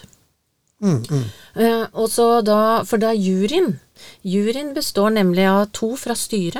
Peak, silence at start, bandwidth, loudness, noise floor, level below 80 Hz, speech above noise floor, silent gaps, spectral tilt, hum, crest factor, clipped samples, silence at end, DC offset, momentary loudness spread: -4 dBFS; 0.05 s; 18.5 kHz; -18 LUFS; -67 dBFS; -54 dBFS; 49 dB; none; -5.5 dB/octave; none; 16 dB; under 0.1%; 0 s; 0.7%; 8 LU